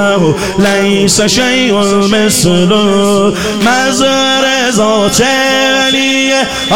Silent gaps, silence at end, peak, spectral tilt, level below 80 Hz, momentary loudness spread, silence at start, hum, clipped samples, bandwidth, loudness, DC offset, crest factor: none; 0 s; 0 dBFS; -3.5 dB/octave; -36 dBFS; 2 LU; 0 s; none; under 0.1%; 17 kHz; -9 LUFS; 2%; 10 dB